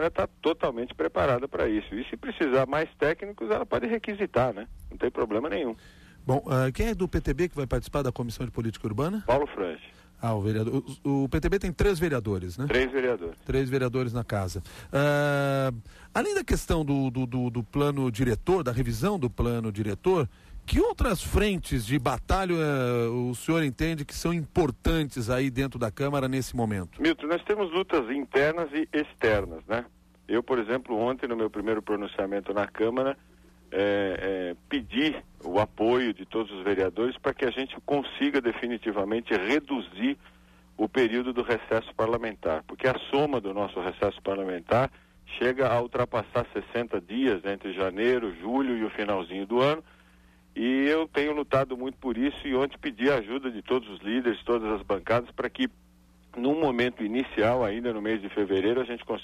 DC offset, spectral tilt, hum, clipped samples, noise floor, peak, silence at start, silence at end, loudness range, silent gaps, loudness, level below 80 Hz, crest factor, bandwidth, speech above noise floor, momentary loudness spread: under 0.1%; -6.5 dB/octave; none; under 0.1%; -57 dBFS; -12 dBFS; 0 s; 0 s; 2 LU; none; -28 LUFS; -42 dBFS; 16 dB; 15 kHz; 30 dB; 7 LU